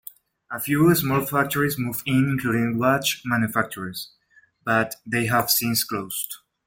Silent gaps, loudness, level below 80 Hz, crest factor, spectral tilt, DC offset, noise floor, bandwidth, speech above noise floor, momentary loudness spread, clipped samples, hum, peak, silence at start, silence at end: none; -22 LUFS; -58 dBFS; 18 dB; -4.5 dB/octave; under 0.1%; -59 dBFS; 17 kHz; 37 dB; 13 LU; under 0.1%; none; -6 dBFS; 0.5 s; 0.3 s